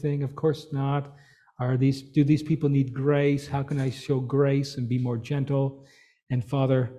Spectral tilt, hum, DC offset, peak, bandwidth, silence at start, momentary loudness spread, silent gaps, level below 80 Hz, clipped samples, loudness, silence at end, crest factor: -8 dB/octave; none; under 0.1%; -10 dBFS; 10.5 kHz; 0 s; 6 LU; 6.22-6.27 s; -58 dBFS; under 0.1%; -26 LUFS; 0 s; 16 dB